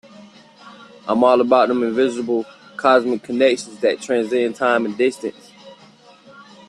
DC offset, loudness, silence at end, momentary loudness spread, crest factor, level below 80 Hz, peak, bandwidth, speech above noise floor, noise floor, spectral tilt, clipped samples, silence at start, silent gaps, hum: under 0.1%; -18 LUFS; 0.25 s; 9 LU; 18 dB; -66 dBFS; -2 dBFS; 11.5 kHz; 30 dB; -48 dBFS; -4.5 dB/octave; under 0.1%; 0.2 s; none; none